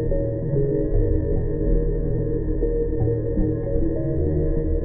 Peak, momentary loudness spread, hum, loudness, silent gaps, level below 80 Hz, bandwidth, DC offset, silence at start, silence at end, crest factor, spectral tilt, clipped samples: -8 dBFS; 2 LU; none; -24 LUFS; none; -24 dBFS; 2 kHz; under 0.1%; 0 s; 0 s; 12 dB; -15 dB/octave; under 0.1%